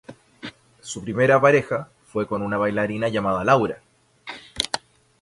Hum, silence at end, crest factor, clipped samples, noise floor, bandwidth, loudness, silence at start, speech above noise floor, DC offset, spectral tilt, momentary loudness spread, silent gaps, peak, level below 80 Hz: none; 0.45 s; 20 dB; under 0.1%; -42 dBFS; 11.5 kHz; -22 LUFS; 0.1 s; 21 dB; under 0.1%; -5 dB/octave; 22 LU; none; -2 dBFS; -54 dBFS